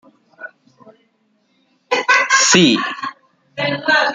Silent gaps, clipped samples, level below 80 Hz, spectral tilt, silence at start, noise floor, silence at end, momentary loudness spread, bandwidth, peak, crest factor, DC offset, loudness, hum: none; under 0.1%; -62 dBFS; -2.5 dB/octave; 0.4 s; -62 dBFS; 0 s; 26 LU; 11 kHz; 0 dBFS; 18 dB; under 0.1%; -14 LUFS; none